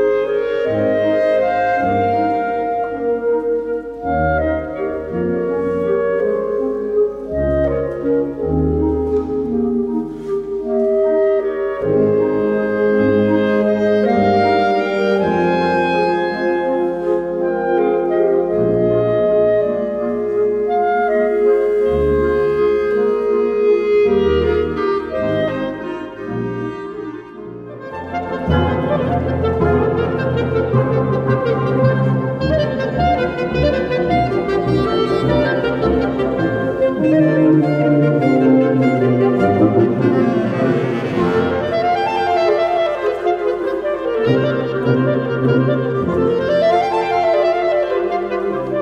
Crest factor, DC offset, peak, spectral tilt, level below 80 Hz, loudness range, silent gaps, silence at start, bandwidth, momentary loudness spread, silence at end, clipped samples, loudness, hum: 16 dB; under 0.1%; 0 dBFS; -8.5 dB/octave; -36 dBFS; 4 LU; none; 0 s; 7.6 kHz; 6 LU; 0 s; under 0.1%; -17 LUFS; none